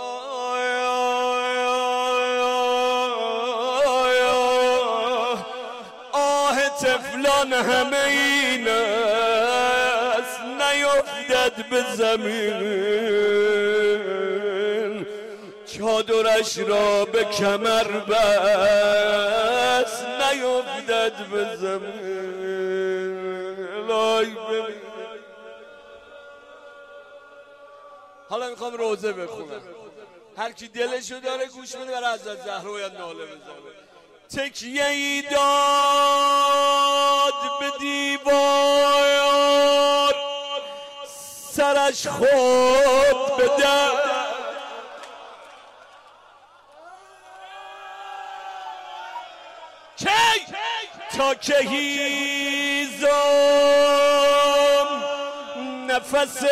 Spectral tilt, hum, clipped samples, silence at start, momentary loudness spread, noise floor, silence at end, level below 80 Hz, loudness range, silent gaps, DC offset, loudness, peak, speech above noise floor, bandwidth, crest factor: -2 dB/octave; none; under 0.1%; 0 s; 18 LU; -51 dBFS; 0 s; -58 dBFS; 13 LU; none; under 0.1%; -21 LUFS; -10 dBFS; 31 dB; 16 kHz; 12 dB